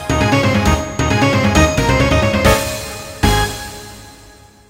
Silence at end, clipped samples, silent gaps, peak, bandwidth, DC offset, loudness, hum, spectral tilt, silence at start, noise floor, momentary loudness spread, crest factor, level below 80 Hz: 0.55 s; under 0.1%; none; 0 dBFS; 16.5 kHz; under 0.1%; -14 LUFS; none; -5 dB/octave; 0 s; -42 dBFS; 14 LU; 16 dB; -24 dBFS